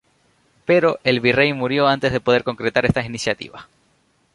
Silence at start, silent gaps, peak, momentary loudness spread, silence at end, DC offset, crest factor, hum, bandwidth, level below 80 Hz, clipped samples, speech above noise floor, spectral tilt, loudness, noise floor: 0.7 s; none; -2 dBFS; 8 LU; 0.7 s; under 0.1%; 18 dB; none; 11.5 kHz; -46 dBFS; under 0.1%; 43 dB; -5.5 dB/octave; -18 LUFS; -62 dBFS